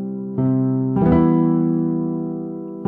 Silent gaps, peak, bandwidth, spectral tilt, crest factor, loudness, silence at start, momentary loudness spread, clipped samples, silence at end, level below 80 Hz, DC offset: none; -4 dBFS; 3.2 kHz; -13 dB/octave; 14 dB; -19 LUFS; 0 s; 11 LU; under 0.1%; 0 s; -40 dBFS; under 0.1%